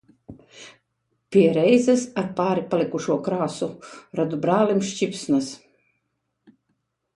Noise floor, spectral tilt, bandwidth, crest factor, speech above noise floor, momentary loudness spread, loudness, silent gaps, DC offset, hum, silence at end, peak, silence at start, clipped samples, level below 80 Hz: -76 dBFS; -6 dB/octave; 11.5 kHz; 18 dB; 54 dB; 15 LU; -22 LUFS; none; under 0.1%; none; 1.6 s; -6 dBFS; 0.3 s; under 0.1%; -64 dBFS